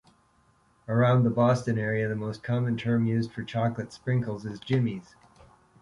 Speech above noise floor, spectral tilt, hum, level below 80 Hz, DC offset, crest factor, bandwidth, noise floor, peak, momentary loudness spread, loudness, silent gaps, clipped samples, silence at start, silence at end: 38 dB; -8 dB/octave; none; -60 dBFS; under 0.1%; 16 dB; 11 kHz; -64 dBFS; -12 dBFS; 11 LU; -27 LUFS; none; under 0.1%; 0.9 s; 0.8 s